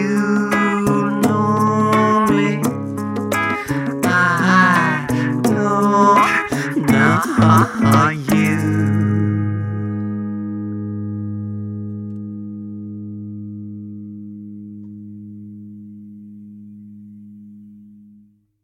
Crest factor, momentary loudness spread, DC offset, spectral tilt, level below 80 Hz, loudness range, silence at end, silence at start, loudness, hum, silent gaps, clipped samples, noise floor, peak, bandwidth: 18 dB; 22 LU; under 0.1%; -6.5 dB/octave; -52 dBFS; 20 LU; 0.8 s; 0 s; -17 LUFS; none; none; under 0.1%; -51 dBFS; -2 dBFS; 16.5 kHz